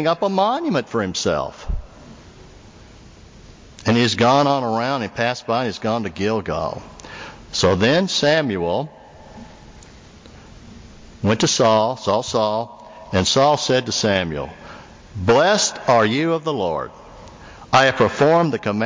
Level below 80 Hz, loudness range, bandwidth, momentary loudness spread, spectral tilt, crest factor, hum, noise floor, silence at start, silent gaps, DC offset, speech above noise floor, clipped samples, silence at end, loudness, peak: -42 dBFS; 6 LU; 7.6 kHz; 16 LU; -4.5 dB/octave; 18 dB; none; -44 dBFS; 0 s; none; under 0.1%; 25 dB; under 0.1%; 0 s; -19 LUFS; -2 dBFS